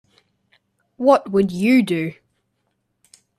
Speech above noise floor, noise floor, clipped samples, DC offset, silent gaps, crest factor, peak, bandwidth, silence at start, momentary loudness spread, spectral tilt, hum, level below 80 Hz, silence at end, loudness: 55 dB; -71 dBFS; under 0.1%; under 0.1%; none; 20 dB; -2 dBFS; 14 kHz; 1 s; 8 LU; -7 dB/octave; none; -60 dBFS; 1.25 s; -18 LUFS